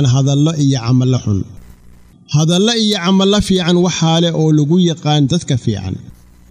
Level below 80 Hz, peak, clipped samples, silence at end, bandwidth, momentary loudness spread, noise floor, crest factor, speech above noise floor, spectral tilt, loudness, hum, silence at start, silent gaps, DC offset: -40 dBFS; -2 dBFS; under 0.1%; 0.4 s; 10.5 kHz; 8 LU; -42 dBFS; 10 dB; 29 dB; -5.5 dB/octave; -13 LUFS; none; 0 s; none; under 0.1%